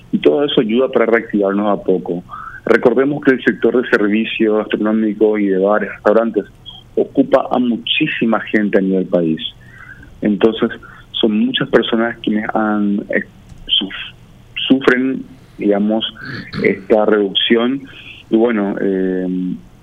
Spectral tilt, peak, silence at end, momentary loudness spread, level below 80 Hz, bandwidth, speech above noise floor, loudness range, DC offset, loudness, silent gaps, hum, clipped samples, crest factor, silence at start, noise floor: -7 dB/octave; 0 dBFS; 0.15 s; 12 LU; -48 dBFS; 7.4 kHz; 22 dB; 3 LU; under 0.1%; -15 LUFS; none; none; under 0.1%; 16 dB; 0.15 s; -37 dBFS